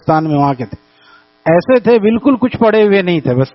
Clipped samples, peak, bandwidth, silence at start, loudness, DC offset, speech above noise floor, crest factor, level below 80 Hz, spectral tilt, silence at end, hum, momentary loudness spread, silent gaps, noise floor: under 0.1%; 0 dBFS; 6 kHz; 0.05 s; -12 LUFS; under 0.1%; 35 dB; 12 dB; -48 dBFS; -6 dB/octave; 0.05 s; none; 8 LU; none; -46 dBFS